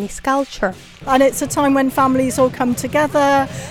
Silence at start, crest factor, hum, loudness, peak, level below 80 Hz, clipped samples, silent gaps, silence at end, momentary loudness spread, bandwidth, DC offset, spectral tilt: 0 s; 14 dB; none; -16 LUFS; -4 dBFS; -42 dBFS; under 0.1%; none; 0 s; 7 LU; 17 kHz; under 0.1%; -4.5 dB/octave